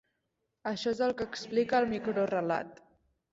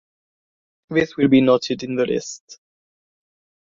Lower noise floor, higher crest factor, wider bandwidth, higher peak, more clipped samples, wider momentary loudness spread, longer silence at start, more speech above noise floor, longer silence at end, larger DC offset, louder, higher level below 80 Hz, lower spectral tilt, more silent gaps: second, -82 dBFS vs under -90 dBFS; about the same, 18 dB vs 20 dB; about the same, 8 kHz vs 7.6 kHz; second, -14 dBFS vs -2 dBFS; neither; second, 9 LU vs 13 LU; second, 0.65 s vs 0.9 s; second, 51 dB vs over 71 dB; second, 0.6 s vs 1.25 s; neither; second, -32 LUFS vs -19 LUFS; second, -66 dBFS vs -60 dBFS; about the same, -5.5 dB/octave vs -5.5 dB/octave; second, none vs 2.40-2.48 s